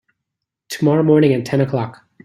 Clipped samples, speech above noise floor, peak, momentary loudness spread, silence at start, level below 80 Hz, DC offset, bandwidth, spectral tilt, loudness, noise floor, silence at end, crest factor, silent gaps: under 0.1%; 65 dB; -2 dBFS; 14 LU; 0.7 s; -58 dBFS; under 0.1%; 15 kHz; -7.5 dB/octave; -16 LUFS; -80 dBFS; 0.35 s; 16 dB; none